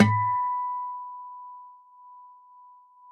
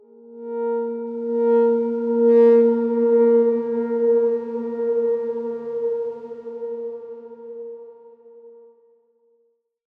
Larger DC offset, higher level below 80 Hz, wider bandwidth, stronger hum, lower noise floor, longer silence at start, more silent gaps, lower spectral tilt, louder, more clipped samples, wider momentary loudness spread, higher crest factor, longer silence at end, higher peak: neither; first, -62 dBFS vs -80 dBFS; first, 8.6 kHz vs 3.2 kHz; neither; second, -53 dBFS vs -67 dBFS; second, 0 s vs 0.3 s; neither; second, -7 dB/octave vs -9.5 dB/octave; second, -28 LUFS vs -20 LUFS; neither; first, 25 LU vs 20 LU; first, 26 dB vs 14 dB; second, 0.85 s vs 1.5 s; about the same, -4 dBFS vs -6 dBFS